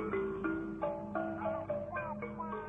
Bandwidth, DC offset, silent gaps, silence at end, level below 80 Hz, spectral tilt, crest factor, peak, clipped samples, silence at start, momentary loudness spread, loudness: 3.9 kHz; under 0.1%; none; 0 s; -60 dBFS; -9 dB/octave; 16 dB; -22 dBFS; under 0.1%; 0 s; 4 LU; -38 LUFS